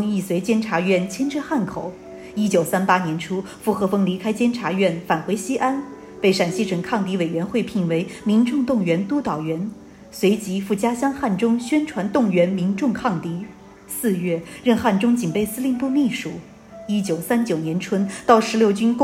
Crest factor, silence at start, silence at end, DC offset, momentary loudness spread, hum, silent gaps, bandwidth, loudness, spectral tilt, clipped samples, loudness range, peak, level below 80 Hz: 20 dB; 0 s; 0 s; under 0.1%; 9 LU; none; none; 16 kHz; -21 LUFS; -6 dB/octave; under 0.1%; 1 LU; -2 dBFS; -56 dBFS